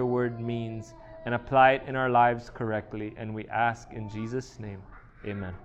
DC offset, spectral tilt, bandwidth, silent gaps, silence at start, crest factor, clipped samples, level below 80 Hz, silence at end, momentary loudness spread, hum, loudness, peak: under 0.1%; -7 dB/octave; 8.4 kHz; none; 0 s; 20 dB; under 0.1%; -54 dBFS; 0 s; 20 LU; none; -28 LUFS; -8 dBFS